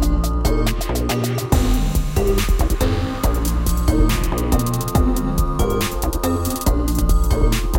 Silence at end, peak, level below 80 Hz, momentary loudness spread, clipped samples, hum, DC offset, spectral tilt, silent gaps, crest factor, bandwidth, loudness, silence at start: 0 s; -2 dBFS; -20 dBFS; 3 LU; under 0.1%; none; under 0.1%; -5.5 dB/octave; none; 14 dB; 17 kHz; -20 LUFS; 0 s